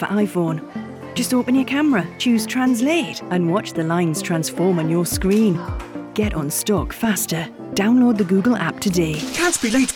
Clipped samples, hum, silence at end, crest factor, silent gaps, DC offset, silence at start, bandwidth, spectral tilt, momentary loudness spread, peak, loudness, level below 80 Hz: under 0.1%; none; 0 s; 12 dB; none; under 0.1%; 0 s; 18.5 kHz; -5 dB/octave; 8 LU; -6 dBFS; -19 LUFS; -40 dBFS